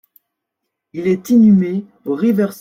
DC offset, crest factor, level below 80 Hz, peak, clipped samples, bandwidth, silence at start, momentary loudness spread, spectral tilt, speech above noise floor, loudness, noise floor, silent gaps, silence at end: under 0.1%; 12 dB; -58 dBFS; -4 dBFS; under 0.1%; 16 kHz; 0.95 s; 14 LU; -8.5 dB/octave; 64 dB; -15 LUFS; -78 dBFS; none; 0.05 s